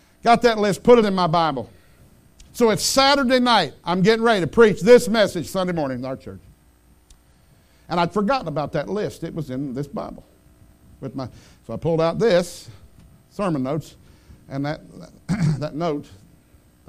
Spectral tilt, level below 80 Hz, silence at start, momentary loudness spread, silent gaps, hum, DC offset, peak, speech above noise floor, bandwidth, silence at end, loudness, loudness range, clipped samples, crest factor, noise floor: -5 dB/octave; -48 dBFS; 0.25 s; 19 LU; none; none; under 0.1%; 0 dBFS; 35 dB; 15.5 kHz; 0.75 s; -20 LUFS; 11 LU; under 0.1%; 20 dB; -55 dBFS